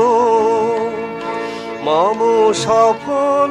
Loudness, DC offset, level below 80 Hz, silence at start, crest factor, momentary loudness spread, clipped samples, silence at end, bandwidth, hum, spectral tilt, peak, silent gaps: -15 LUFS; under 0.1%; -56 dBFS; 0 s; 12 dB; 10 LU; under 0.1%; 0 s; 11 kHz; none; -4.5 dB/octave; -2 dBFS; none